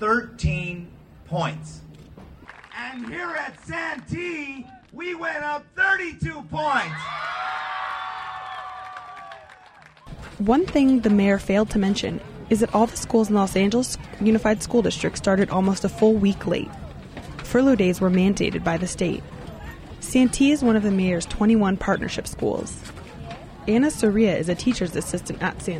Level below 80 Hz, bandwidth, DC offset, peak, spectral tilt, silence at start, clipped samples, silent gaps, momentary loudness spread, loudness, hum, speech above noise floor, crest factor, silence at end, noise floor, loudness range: -42 dBFS; 14 kHz; under 0.1%; -8 dBFS; -5.5 dB/octave; 0 s; under 0.1%; none; 19 LU; -22 LUFS; none; 28 dB; 16 dB; 0 s; -49 dBFS; 10 LU